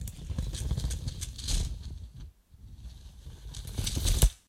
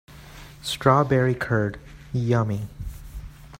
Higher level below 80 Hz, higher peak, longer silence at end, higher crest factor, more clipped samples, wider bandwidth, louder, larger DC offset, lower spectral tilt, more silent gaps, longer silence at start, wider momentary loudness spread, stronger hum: first, -34 dBFS vs -44 dBFS; about the same, -6 dBFS vs -4 dBFS; about the same, 0.1 s vs 0.05 s; about the same, 26 dB vs 22 dB; neither; about the same, 16 kHz vs 16 kHz; second, -34 LUFS vs -23 LUFS; neither; second, -3.5 dB/octave vs -6.5 dB/octave; neither; about the same, 0 s vs 0.1 s; second, 20 LU vs 23 LU; neither